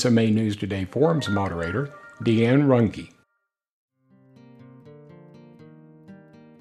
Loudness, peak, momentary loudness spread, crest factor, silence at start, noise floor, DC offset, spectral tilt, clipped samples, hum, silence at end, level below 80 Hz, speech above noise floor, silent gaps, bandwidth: -23 LUFS; -6 dBFS; 11 LU; 18 dB; 0 s; -77 dBFS; under 0.1%; -7 dB/octave; under 0.1%; none; 0.45 s; -56 dBFS; 56 dB; 3.72-3.88 s; 11.5 kHz